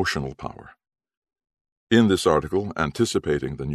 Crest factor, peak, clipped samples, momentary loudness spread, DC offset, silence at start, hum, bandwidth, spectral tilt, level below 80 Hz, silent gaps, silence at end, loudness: 20 dB; -4 dBFS; under 0.1%; 14 LU; under 0.1%; 0 s; none; 13.5 kHz; -5.5 dB/octave; -46 dBFS; 1.17-1.22 s, 1.61-1.65 s, 1.72-1.87 s; 0 s; -22 LUFS